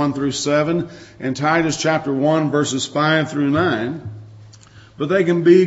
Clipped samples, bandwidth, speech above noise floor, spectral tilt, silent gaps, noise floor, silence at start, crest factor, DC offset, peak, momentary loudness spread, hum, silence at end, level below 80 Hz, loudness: under 0.1%; 8 kHz; 27 dB; -5 dB/octave; none; -44 dBFS; 0 s; 16 dB; under 0.1%; -2 dBFS; 11 LU; none; 0 s; -54 dBFS; -18 LUFS